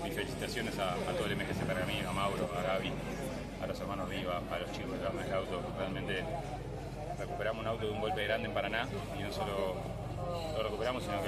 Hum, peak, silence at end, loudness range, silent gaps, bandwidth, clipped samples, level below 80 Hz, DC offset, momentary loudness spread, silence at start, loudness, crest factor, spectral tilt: none; -18 dBFS; 0 s; 3 LU; none; 14.5 kHz; under 0.1%; -50 dBFS; under 0.1%; 6 LU; 0 s; -37 LUFS; 18 dB; -5.5 dB/octave